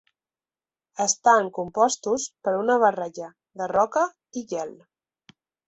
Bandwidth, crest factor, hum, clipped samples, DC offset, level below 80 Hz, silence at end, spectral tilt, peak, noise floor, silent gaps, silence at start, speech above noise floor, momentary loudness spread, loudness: 8.4 kHz; 20 dB; none; under 0.1%; under 0.1%; -70 dBFS; 0.95 s; -2.5 dB/octave; -6 dBFS; under -90 dBFS; none; 1 s; over 67 dB; 17 LU; -23 LUFS